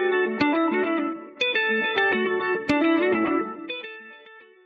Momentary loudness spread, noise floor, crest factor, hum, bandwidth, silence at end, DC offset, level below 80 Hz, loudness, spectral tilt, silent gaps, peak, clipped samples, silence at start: 12 LU; -49 dBFS; 18 dB; none; 7.4 kHz; 0.25 s; under 0.1%; -62 dBFS; -23 LUFS; -2 dB/octave; none; -6 dBFS; under 0.1%; 0 s